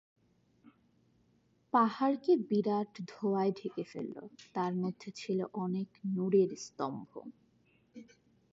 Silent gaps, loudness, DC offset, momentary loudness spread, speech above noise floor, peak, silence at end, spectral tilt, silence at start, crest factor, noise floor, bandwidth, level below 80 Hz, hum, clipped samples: none; -34 LUFS; under 0.1%; 14 LU; 38 dB; -16 dBFS; 0.5 s; -7 dB/octave; 0.65 s; 18 dB; -71 dBFS; 7.8 kHz; -84 dBFS; none; under 0.1%